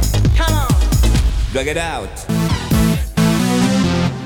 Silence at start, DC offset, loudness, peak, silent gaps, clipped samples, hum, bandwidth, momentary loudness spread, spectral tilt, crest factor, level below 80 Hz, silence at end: 0 s; under 0.1%; -16 LUFS; -4 dBFS; none; under 0.1%; none; 19.5 kHz; 5 LU; -5.5 dB/octave; 10 dB; -20 dBFS; 0 s